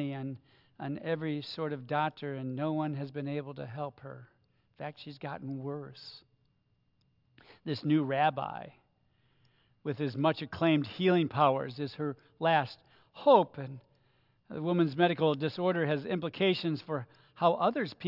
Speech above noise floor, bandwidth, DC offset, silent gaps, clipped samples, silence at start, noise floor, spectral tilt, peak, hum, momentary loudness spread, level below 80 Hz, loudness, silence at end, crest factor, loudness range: 42 dB; 5.8 kHz; under 0.1%; none; under 0.1%; 0 s; -73 dBFS; -8.5 dB/octave; -10 dBFS; none; 17 LU; -76 dBFS; -31 LUFS; 0 s; 22 dB; 12 LU